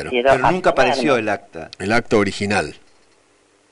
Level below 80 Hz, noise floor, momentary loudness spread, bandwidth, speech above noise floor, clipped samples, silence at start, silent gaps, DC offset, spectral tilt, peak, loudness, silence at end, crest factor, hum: -42 dBFS; -57 dBFS; 12 LU; 11.5 kHz; 39 dB; under 0.1%; 0 s; none; under 0.1%; -5 dB/octave; -6 dBFS; -18 LUFS; 0.95 s; 14 dB; none